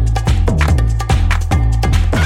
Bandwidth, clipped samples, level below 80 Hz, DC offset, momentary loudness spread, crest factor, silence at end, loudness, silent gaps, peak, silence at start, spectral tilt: 14 kHz; under 0.1%; -16 dBFS; under 0.1%; 2 LU; 12 dB; 0 s; -15 LUFS; none; 0 dBFS; 0 s; -6 dB/octave